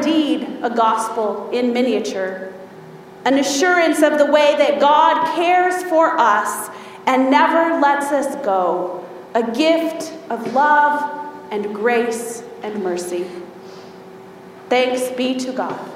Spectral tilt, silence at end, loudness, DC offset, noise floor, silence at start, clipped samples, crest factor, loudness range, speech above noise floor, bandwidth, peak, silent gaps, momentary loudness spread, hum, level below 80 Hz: -3.5 dB/octave; 0 s; -17 LUFS; under 0.1%; -38 dBFS; 0 s; under 0.1%; 16 dB; 8 LU; 22 dB; 16 kHz; 0 dBFS; none; 15 LU; none; -68 dBFS